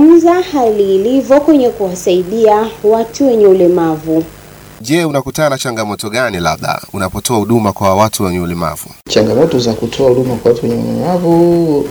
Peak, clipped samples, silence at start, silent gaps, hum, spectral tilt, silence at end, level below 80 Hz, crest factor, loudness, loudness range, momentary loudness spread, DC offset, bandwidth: 0 dBFS; 0.3%; 0 s; none; none; -5.5 dB/octave; 0 s; -40 dBFS; 12 dB; -12 LUFS; 4 LU; 9 LU; under 0.1%; over 20 kHz